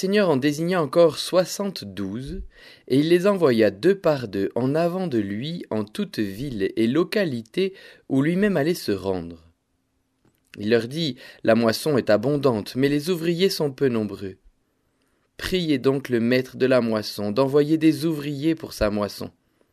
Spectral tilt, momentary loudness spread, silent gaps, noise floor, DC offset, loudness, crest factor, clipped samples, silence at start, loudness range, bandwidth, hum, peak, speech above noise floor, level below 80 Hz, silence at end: -6 dB/octave; 11 LU; none; -71 dBFS; under 0.1%; -23 LUFS; 18 dB; under 0.1%; 0 s; 4 LU; 14.5 kHz; none; -4 dBFS; 49 dB; -50 dBFS; 0.45 s